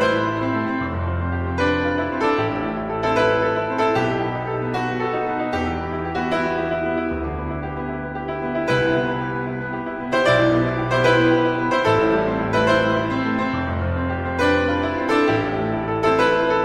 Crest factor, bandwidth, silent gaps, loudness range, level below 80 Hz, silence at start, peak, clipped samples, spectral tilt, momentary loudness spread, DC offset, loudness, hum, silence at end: 16 dB; 11 kHz; none; 5 LU; -40 dBFS; 0 s; -6 dBFS; under 0.1%; -6.5 dB/octave; 8 LU; under 0.1%; -21 LUFS; none; 0 s